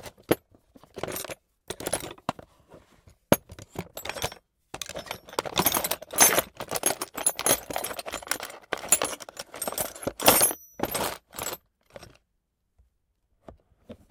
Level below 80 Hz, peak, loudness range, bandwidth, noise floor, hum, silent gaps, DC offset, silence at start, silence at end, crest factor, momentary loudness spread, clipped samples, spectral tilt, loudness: -56 dBFS; 0 dBFS; 9 LU; 18 kHz; -76 dBFS; none; none; under 0.1%; 0 s; 0.15 s; 30 dB; 19 LU; under 0.1%; -1.5 dB/octave; -26 LUFS